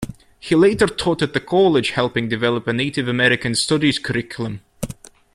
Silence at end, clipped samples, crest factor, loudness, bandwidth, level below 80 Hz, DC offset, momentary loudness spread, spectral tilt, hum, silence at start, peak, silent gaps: 0.4 s; under 0.1%; 18 dB; -18 LUFS; 13.5 kHz; -46 dBFS; under 0.1%; 16 LU; -5 dB/octave; none; 0 s; -2 dBFS; none